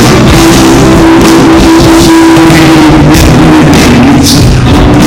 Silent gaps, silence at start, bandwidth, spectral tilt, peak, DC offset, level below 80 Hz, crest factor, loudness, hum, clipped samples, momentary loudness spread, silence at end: none; 0 s; 18 kHz; -5.5 dB/octave; 0 dBFS; under 0.1%; -14 dBFS; 2 dB; -2 LUFS; none; 30%; 1 LU; 0 s